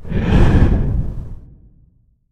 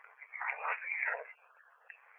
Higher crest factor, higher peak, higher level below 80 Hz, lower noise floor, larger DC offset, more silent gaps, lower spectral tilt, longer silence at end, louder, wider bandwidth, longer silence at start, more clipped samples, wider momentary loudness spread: about the same, 16 dB vs 20 dB; first, 0 dBFS vs -22 dBFS; first, -20 dBFS vs under -90 dBFS; second, -54 dBFS vs -64 dBFS; neither; neither; first, -8.5 dB/octave vs 16.5 dB/octave; first, 0.9 s vs 0 s; first, -16 LUFS vs -37 LUFS; first, 8.2 kHz vs 3.5 kHz; about the same, 0 s vs 0 s; neither; second, 18 LU vs 21 LU